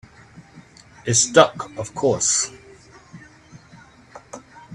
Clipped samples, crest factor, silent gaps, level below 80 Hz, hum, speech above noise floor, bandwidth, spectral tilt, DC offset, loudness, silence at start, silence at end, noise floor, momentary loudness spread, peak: under 0.1%; 24 dB; none; -58 dBFS; none; 29 dB; 12.5 kHz; -2.5 dB/octave; under 0.1%; -18 LUFS; 0.35 s; 0 s; -48 dBFS; 25 LU; 0 dBFS